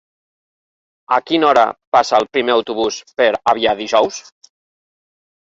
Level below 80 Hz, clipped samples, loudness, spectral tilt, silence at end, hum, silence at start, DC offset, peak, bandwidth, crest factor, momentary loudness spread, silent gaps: -58 dBFS; under 0.1%; -16 LUFS; -3 dB/octave; 1.3 s; none; 1.1 s; under 0.1%; 0 dBFS; 8 kHz; 16 dB; 7 LU; 1.87-1.92 s